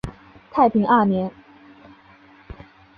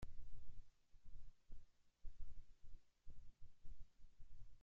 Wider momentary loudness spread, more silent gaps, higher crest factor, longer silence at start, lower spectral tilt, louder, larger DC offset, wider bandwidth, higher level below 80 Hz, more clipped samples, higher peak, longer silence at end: first, 14 LU vs 6 LU; neither; first, 20 dB vs 12 dB; about the same, 0.05 s vs 0 s; first, -8.5 dB/octave vs -6 dB/octave; first, -19 LUFS vs -67 LUFS; neither; first, 5.6 kHz vs 2.8 kHz; first, -48 dBFS vs -58 dBFS; neither; first, -4 dBFS vs -36 dBFS; first, 0.45 s vs 0.05 s